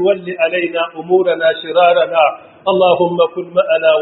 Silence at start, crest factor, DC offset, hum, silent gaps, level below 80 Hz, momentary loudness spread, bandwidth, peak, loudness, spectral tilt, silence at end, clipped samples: 0 s; 14 dB; under 0.1%; none; none; -64 dBFS; 6 LU; 4.1 kHz; 0 dBFS; -14 LUFS; -2.5 dB/octave; 0 s; under 0.1%